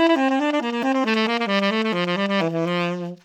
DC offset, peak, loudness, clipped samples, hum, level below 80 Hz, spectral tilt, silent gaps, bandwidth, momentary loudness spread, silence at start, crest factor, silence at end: under 0.1%; -6 dBFS; -21 LUFS; under 0.1%; none; -76 dBFS; -6 dB/octave; none; 12.5 kHz; 3 LU; 0 s; 16 dB; 0.1 s